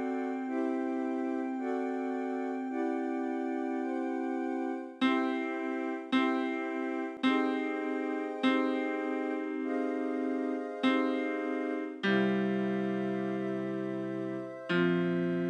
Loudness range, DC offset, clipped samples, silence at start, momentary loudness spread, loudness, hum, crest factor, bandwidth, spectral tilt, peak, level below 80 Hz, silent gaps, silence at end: 2 LU; under 0.1%; under 0.1%; 0 s; 6 LU; -32 LUFS; none; 16 dB; 8.8 kHz; -7 dB/octave; -16 dBFS; -90 dBFS; none; 0 s